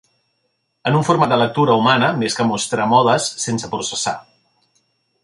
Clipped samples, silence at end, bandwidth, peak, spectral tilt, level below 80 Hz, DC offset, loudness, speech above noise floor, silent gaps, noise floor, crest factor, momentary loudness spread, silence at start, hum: under 0.1%; 1.05 s; 11.5 kHz; -2 dBFS; -4.5 dB/octave; -58 dBFS; under 0.1%; -17 LUFS; 53 dB; none; -69 dBFS; 16 dB; 9 LU; 0.85 s; none